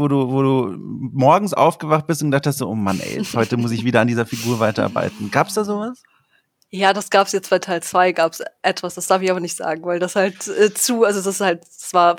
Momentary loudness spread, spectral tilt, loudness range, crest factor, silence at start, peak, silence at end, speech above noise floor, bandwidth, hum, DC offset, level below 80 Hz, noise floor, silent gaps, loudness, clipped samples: 8 LU; -4.5 dB/octave; 2 LU; 18 dB; 0 s; 0 dBFS; 0 s; 44 dB; over 20 kHz; none; under 0.1%; -64 dBFS; -62 dBFS; none; -19 LUFS; under 0.1%